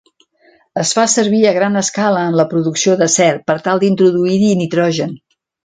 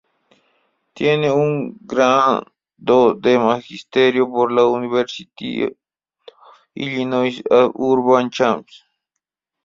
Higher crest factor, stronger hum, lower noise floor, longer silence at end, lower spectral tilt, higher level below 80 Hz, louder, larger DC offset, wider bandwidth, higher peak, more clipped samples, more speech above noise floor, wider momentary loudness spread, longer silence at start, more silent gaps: about the same, 14 dB vs 16 dB; neither; second, -52 dBFS vs -81 dBFS; second, 0.5 s vs 1 s; second, -4.5 dB/octave vs -6 dB/octave; about the same, -58 dBFS vs -62 dBFS; first, -14 LUFS vs -17 LUFS; neither; first, 9.6 kHz vs 7.4 kHz; about the same, 0 dBFS vs -2 dBFS; neither; second, 39 dB vs 64 dB; second, 5 LU vs 11 LU; second, 0.75 s vs 0.95 s; neither